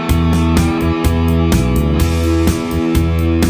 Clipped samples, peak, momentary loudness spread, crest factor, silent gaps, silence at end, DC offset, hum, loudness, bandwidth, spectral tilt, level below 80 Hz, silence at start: under 0.1%; 0 dBFS; 2 LU; 12 dB; none; 0 s; under 0.1%; none; -14 LUFS; 16 kHz; -6.5 dB/octave; -18 dBFS; 0 s